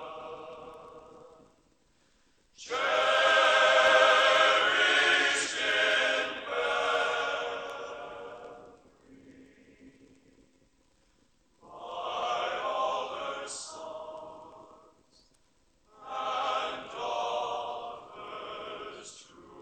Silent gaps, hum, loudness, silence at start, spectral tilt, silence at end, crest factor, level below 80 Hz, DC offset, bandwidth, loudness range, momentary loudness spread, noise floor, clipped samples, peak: none; none; -26 LUFS; 0 s; -0.5 dB/octave; 0 s; 22 dB; -70 dBFS; under 0.1%; 10.5 kHz; 17 LU; 24 LU; -68 dBFS; under 0.1%; -10 dBFS